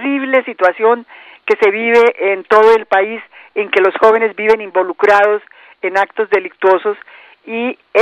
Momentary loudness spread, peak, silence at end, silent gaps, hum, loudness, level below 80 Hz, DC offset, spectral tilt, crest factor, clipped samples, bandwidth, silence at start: 11 LU; 0 dBFS; 0 s; none; none; -13 LUFS; -58 dBFS; under 0.1%; -4.5 dB/octave; 14 dB; under 0.1%; 8.2 kHz; 0 s